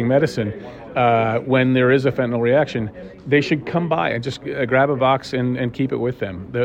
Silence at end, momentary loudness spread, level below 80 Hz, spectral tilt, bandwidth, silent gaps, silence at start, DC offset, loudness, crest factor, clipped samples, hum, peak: 0 s; 11 LU; -50 dBFS; -7.5 dB/octave; 9.8 kHz; none; 0 s; under 0.1%; -19 LUFS; 16 dB; under 0.1%; none; -4 dBFS